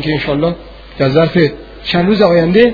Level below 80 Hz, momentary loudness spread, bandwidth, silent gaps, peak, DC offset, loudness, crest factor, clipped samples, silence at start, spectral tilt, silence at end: -36 dBFS; 9 LU; 5.4 kHz; none; 0 dBFS; under 0.1%; -12 LUFS; 12 dB; 0.1%; 0 s; -8.5 dB/octave; 0 s